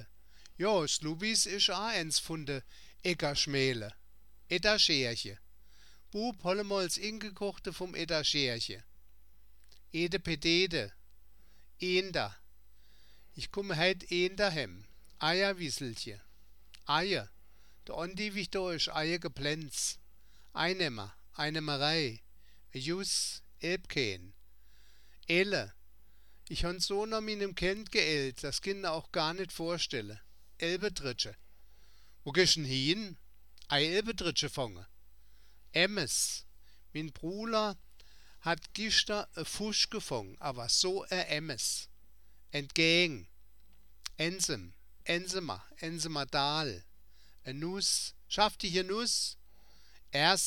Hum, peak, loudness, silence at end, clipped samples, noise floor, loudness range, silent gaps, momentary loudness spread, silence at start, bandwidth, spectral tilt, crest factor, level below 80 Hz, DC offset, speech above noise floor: none; -10 dBFS; -32 LUFS; 0 s; under 0.1%; -64 dBFS; 4 LU; none; 13 LU; 0 s; 18.5 kHz; -2.5 dB/octave; 26 dB; -56 dBFS; 0.2%; 30 dB